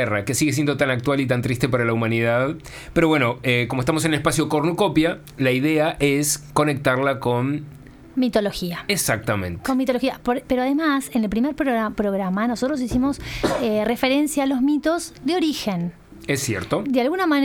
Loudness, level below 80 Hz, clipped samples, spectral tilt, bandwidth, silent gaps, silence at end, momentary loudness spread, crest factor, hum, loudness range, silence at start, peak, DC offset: -21 LUFS; -46 dBFS; under 0.1%; -5 dB/octave; 19 kHz; none; 0 s; 6 LU; 18 dB; none; 2 LU; 0 s; -4 dBFS; under 0.1%